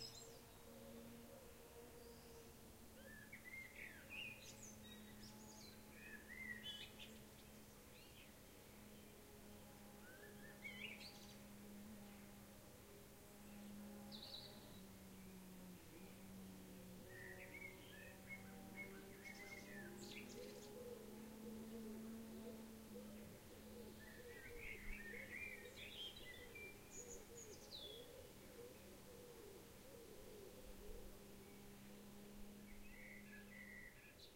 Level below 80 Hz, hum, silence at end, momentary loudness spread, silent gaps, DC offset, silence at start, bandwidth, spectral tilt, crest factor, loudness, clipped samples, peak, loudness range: -68 dBFS; none; 0 s; 9 LU; none; under 0.1%; 0 s; 16 kHz; -3.5 dB/octave; 20 dB; -57 LUFS; under 0.1%; -38 dBFS; 6 LU